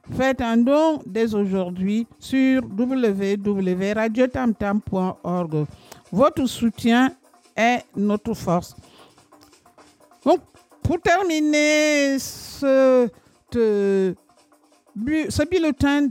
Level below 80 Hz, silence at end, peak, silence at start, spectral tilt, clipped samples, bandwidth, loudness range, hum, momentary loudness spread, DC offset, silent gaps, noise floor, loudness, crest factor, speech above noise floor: -48 dBFS; 0 s; -6 dBFS; 0.05 s; -5.5 dB/octave; under 0.1%; 16.5 kHz; 5 LU; none; 9 LU; under 0.1%; none; -57 dBFS; -21 LUFS; 16 dB; 37 dB